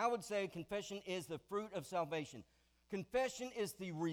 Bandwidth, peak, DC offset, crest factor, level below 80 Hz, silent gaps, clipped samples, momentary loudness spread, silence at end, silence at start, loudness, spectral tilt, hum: over 20 kHz; -24 dBFS; under 0.1%; 18 dB; -74 dBFS; none; under 0.1%; 7 LU; 0 s; 0 s; -43 LUFS; -4.5 dB/octave; none